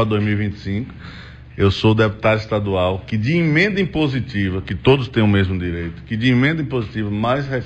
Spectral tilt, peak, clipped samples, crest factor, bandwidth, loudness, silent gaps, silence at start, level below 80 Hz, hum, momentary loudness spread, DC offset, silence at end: -7.5 dB/octave; -2 dBFS; under 0.1%; 16 dB; 8 kHz; -19 LUFS; none; 0 s; -40 dBFS; none; 10 LU; under 0.1%; 0 s